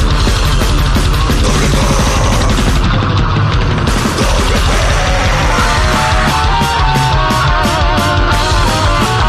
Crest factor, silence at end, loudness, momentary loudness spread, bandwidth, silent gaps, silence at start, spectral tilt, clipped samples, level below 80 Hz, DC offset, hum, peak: 8 dB; 0 s; -12 LUFS; 2 LU; 15 kHz; none; 0 s; -4.5 dB/octave; under 0.1%; -14 dBFS; under 0.1%; none; -2 dBFS